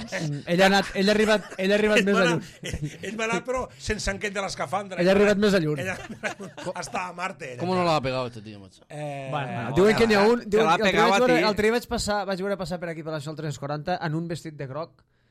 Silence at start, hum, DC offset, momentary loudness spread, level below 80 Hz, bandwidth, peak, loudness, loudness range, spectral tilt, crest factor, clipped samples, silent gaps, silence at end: 0 s; none; under 0.1%; 15 LU; -48 dBFS; 15 kHz; -8 dBFS; -24 LUFS; 8 LU; -5 dB/octave; 18 dB; under 0.1%; none; 0.45 s